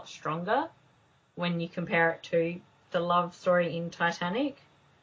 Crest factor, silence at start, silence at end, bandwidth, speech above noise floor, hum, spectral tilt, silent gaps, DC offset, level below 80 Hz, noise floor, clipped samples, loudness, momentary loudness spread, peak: 20 dB; 0 s; 0.5 s; 7.6 kHz; 36 dB; none; -6 dB/octave; none; under 0.1%; -70 dBFS; -65 dBFS; under 0.1%; -30 LUFS; 8 LU; -12 dBFS